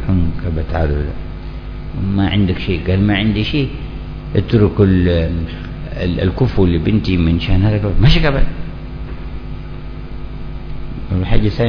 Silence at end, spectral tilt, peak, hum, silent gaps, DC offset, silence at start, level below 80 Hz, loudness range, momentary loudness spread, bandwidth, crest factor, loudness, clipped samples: 0 s; -9 dB/octave; 0 dBFS; none; none; under 0.1%; 0 s; -22 dBFS; 4 LU; 17 LU; 5.4 kHz; 16 dB; -16 LUFS; under 0.1%